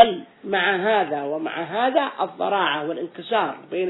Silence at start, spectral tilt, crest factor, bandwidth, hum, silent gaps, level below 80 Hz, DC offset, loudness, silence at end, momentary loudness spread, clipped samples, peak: 0 s; -8 dB/octave; 20 dB; 4.1 kHz; none; none; -66 dBFS; under 0.1%; -23 LUFS; 0 s; 7 LU; under 0.1%; -2 dBFS